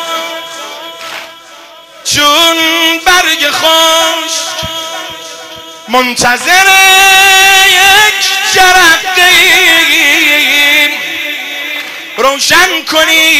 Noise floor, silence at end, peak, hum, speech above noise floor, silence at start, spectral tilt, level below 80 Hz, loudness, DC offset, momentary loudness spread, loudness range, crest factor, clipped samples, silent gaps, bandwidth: -33 dBFS; 0 s; 0 dBFS; none; 27 dB; 0 s; 0 dB/octave; -42 dBFS; -5 LUFS; under 0.1%; 19 LU; 6 LU; 8 dB; 2%; none; over 20 kHz